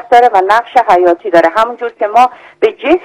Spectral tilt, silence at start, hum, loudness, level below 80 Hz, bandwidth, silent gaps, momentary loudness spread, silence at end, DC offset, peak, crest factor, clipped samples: -4.5 dB/octave; 0.1 s; none; -10 LUFS; -50 dBFS; 12 kHz; none; 7 LU; 0.05 s; under 0.1%; 0 dBFS; 10 dB; 4%